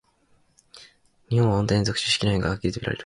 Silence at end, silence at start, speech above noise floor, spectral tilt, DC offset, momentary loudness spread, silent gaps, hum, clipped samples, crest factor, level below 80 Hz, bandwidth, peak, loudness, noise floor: 0 s; 0.75 s; 40 dB; -5 dB/octave; under 0.1%; 6 LU; none; none; under 0.1%; 18 dB; -44 dBFS; 11.5 kHz; -8 dBFS; -23 LUFS; -63 dBFS